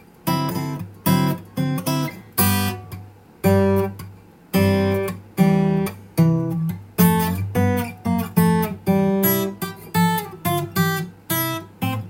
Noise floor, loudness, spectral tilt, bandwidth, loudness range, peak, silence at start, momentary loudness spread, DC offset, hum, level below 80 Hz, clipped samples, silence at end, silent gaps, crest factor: -42 dBFS; -21 LUFS; -6 dB/octave; 17 kHz; 2 LU; -2 dBFS; 0.25 s; 9 LU; under 0.1%; none; -54 dBFS; under 0.1%; 0 s; none; 18 dB